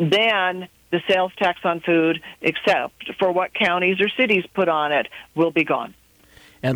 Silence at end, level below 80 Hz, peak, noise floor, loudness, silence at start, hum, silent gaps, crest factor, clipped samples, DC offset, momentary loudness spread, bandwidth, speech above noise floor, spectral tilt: 0 s; -62 dBFS; -6 dBFS; -51 dBFS; -20 LUFS; 0 s; none; none; 16 dB; under 0.1%; under 0.1%; 8 LU; 19.5 kHz; 31 dB; -6 dB/octave